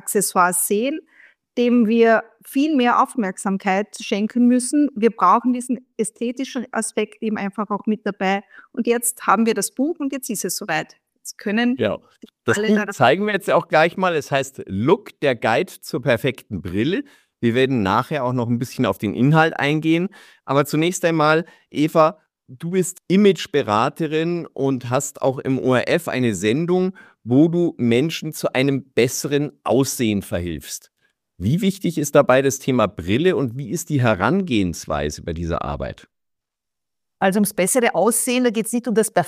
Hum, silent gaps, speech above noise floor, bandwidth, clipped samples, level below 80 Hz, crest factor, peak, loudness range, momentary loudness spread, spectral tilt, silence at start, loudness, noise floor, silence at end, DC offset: none; none; 65 dB; 15.5 kHz; under 0.1%; -50 dBFS; 18 dB; -2 dBFS; 4 LU; 9 LU; -5 dB/octave; 0.05 s; -20 LUFS; -84 dBFS; 0 s; under 0.1%